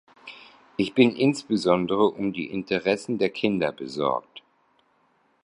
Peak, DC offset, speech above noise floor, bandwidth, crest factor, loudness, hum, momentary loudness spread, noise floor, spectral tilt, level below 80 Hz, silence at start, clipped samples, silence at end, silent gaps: -4 dBFS; under 0.1%; 42 dB; 11 kHz; 20 dB; -24 LUFS; none; 11 LU; -66 dBFS; -6 dB/octave; -62 dBFS; 0.25 s; under 0.1%; 1.05 s; none